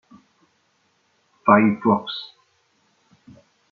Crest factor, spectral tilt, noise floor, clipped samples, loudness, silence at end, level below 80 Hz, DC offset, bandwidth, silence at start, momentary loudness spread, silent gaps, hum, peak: 22 dB; -4.5 dB/octave; -66 dBFS; under 0.1%; -19 LUFS; 1.45 s; -70 dBFS; under 0.1%; 4.7 kHz; 1.45 s; 17 LU; none; none; -2 dBFS